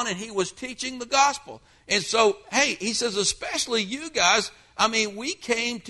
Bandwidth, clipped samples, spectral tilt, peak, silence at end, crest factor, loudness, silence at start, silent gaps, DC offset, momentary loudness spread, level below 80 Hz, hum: 11.5 kHz; under 0.1%; -1.5 dB/octave; -6 dBFS; 0 s; 20 dB; -24 LUFS; 0 s; none; under 0.1%; 11 LU; -58 dBFS; none